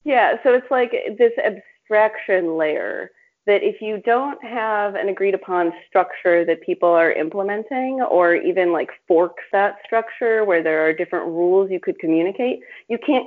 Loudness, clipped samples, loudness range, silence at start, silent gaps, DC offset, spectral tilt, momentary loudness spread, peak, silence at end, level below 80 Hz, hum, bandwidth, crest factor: -19 LUFS; under 0.1%; 2 LU; 0.05 s; none; under 0.1%; -3 dB/octave; 8 LU; -4 dBFS; 0 s; -72 dBFS; none; 4.5 kHz; 16 dB